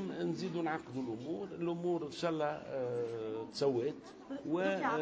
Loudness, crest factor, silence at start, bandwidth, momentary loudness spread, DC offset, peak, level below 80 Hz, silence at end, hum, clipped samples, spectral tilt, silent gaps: -38 LUFS; 16 dB; 0 s; 8 kHz; 7 LU; under 0.1%; -20 dBFS; -74 dBFS; 0 s; none; under 0.1%; -6.5 dB/octave; none